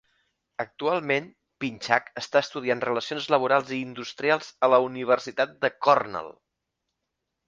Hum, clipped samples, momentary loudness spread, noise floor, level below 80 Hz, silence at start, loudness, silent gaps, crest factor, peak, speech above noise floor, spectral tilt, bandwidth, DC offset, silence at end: none; under 0.1%; 13 LU; -82 dBFS; -70 dBFS; 0.6 s; -25 LUFS; none; 24 dB; -2 dBFS; 57 dB; -4.5 dB/octave; 7.6 kHz; under 0.1%; 1.15 s